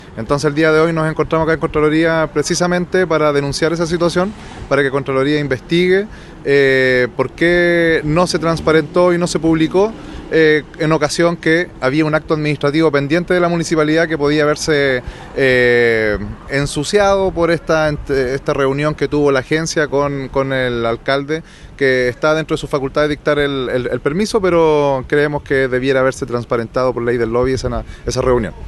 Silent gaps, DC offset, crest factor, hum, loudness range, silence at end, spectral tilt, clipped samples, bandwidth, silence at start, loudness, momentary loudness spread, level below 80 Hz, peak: none; under 0.1%; 14 dB; none; 3 LU; 0 s; -5.5 dB/octave; under 0.1%; 12.5 kHz; 0 s; -15 LUFS; 6 LU; -36 dBFS; 0 dBFS